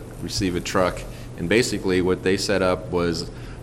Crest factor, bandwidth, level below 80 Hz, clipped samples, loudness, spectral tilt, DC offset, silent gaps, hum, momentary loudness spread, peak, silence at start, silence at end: 20 dB; 16 kHz; -40 dBFS; under 0.1%; -23 LUFS; -4.5 dB/octave; under 0.1%; none; none; 11 LU; -4 dBFS; 0 s; 0 s